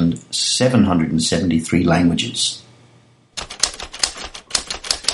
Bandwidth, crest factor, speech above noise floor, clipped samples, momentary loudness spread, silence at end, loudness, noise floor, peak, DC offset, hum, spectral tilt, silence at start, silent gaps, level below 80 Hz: 11.5 kHz; 20 dB; 35 dB; under 0.1%; 13 LU; 0 s; -18 LUFS; -52 dBFS; 0 dBFS; under 0.1%; none; -4 dB/octave; 0 s; none; -44 dBFS